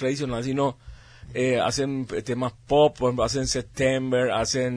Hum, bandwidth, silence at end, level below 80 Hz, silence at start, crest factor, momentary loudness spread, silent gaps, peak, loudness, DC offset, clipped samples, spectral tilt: none; 11 kHz; 0 s; -46 dBFS; 0 s; 18 dB; 9 LU; none; -6 dBFS; -24 LUFS; under 0.1%; under 0.1%; -4.5 dB/octave